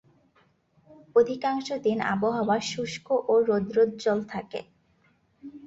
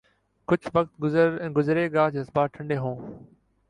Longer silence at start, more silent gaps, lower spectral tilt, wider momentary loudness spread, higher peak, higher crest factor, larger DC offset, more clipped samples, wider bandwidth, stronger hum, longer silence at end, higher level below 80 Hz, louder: first, 0.9 s vs 0.5 s; neither; second, -5 dB/octave vs -8.5 dB/octave; about the same, 12 LU vs 11 LU; about the same, -10 dBFS vs -8 dBFS; about the same, 18 dB vs 18 dB; neither; neither; second, 8 kHz vs 9.8 kHz; neither; second, 0 s vs 0.45 s; second, -66 dBFS vs -60 dBFS; about the same, -26 LUFS vs -25 LUFS